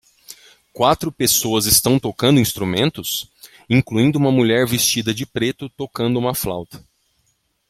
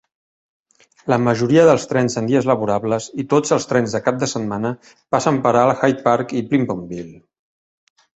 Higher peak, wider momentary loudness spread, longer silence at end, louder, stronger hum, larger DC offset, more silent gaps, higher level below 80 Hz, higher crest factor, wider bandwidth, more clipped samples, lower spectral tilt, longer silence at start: about the same, 0 dBFS vs -2 dBFS; about the same, 12 LU vs 11 LU; second, 0.9 s vs 1.05 s; about the same, -17 LUFS vs -18 LUFS; neither; neither; neither; first, -48 dBFS vs -56 dBFS; about the same, 20 dB vs 18 dB; first, 16.5 kHz vs 8.2 kHz; neither; second, -4 dB/octave vs -6 dB/octave; second, 0.3 s vs 1.05 s